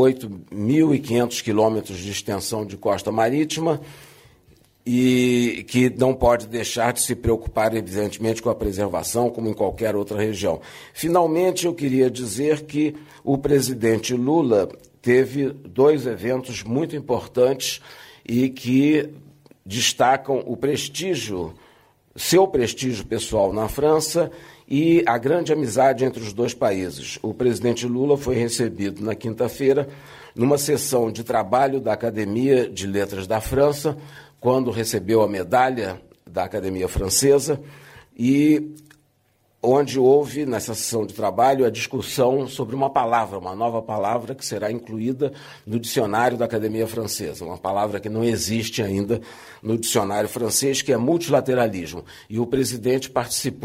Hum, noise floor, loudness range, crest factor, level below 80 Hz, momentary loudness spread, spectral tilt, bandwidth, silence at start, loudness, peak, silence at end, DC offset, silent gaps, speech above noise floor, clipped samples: none; -64 dBFS; 4 LU; 16 dB; -46 dBFS; 10 LU; -5 dB/octave; 16 kHz; 0 s; -22 LUFS; -6 dBFS; 0 s; under 0.1%; none; 43 dB; under 0.1%